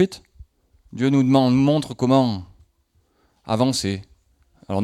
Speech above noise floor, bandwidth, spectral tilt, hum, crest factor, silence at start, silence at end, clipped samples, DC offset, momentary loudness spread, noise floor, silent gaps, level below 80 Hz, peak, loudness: 45 dB; 12.5 kHz; -6.5 dB/octave; none; 18 dB; 0 s; 0 s; under 0.1%; under 0.1%; 16 LU; -64 dBFS; none; -54 dBFS; -4 dBFS; -20 LUFS